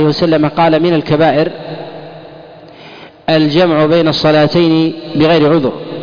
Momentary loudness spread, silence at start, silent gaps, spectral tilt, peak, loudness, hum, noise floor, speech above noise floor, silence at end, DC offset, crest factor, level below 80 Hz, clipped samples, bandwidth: 16 LU; 0 s; none; -7.5 dB/octave; -2 dBFS; -11 LUFS; none; -35 dBFS; 24 dB; 0 s; under 0.1%; 10 dB; -44 dBFS; under 0.1%; 5.2 kHz